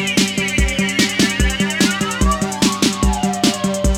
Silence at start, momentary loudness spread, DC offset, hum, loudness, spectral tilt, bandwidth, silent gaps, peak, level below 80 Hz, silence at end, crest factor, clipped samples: 0 s; 2 LU; under 0.1%; none; -16 LUFS; -3.5 dB/octave; 17.5 kHz; none; -2 dBFS; -24 dBFS; 0 s; 16 dB; under 0.1%